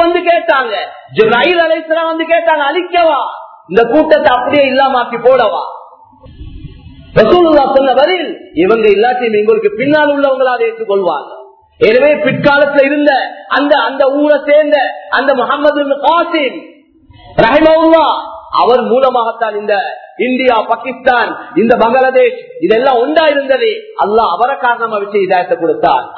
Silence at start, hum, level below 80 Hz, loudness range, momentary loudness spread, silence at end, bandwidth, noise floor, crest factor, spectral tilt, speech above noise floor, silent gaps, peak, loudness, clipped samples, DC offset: 0 s; none; -44 dBFS; 2 LU; 8 LU; 0 s; 6 kHz; -42 dBFS; 10 dB; -7.5 dB/octave; 32 dB; none; 0 dBFS; -10 LUFS; 0.5%; under 0.1%